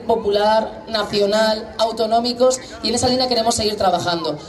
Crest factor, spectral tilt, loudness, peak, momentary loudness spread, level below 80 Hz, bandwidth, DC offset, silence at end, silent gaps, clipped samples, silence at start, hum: 14 dB; -3.5 dB/octave; -18 LUFS; -4 dBFS; 5 LU; -48 dBFS; 13 kHz; under 0.1%; 0 s; none; under 0.1%; 0 s; none